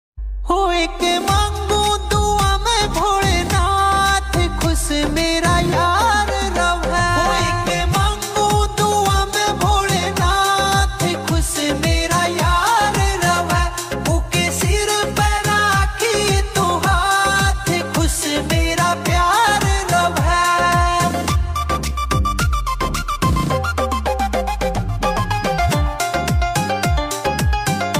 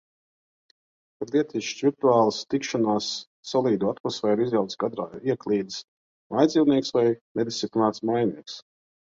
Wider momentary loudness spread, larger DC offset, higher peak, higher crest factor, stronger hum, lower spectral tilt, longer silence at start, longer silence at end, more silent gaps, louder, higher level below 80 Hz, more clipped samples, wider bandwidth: second, 5 LU vs 10 LU; neither; about the same, -4 dBFS vs -6 dBFS; second, 12 dB vs 20 dB; neither; second, -4 dB/octave vs -5.5 dB/octave; second, 0.15 s vs 1.2 s; second, 0 s vs 0.5 s; second, none vs 3.27-3.43 s, 4.00-4.04 s, 5.84-6.30 s, 7.21-7.35 s; first, -17 LUFS vs -25 LUFS; first, -24 dBFS vs -66 dBFS; neither; first, 16 kHz vs 7.8 kHz